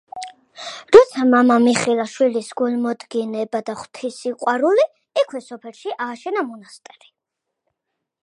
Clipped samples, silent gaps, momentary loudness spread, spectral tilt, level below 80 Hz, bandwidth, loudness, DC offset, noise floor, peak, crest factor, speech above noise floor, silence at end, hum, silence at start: under 0.1%; none; 21 LU; -4 dB/octave; -62 dBFS; 11 kHz; -18 LUFS; under 0.1%; -81 dBFS; 0 dBFS; 20 dB; 62 dB; 1.6 s; none; 0.15 s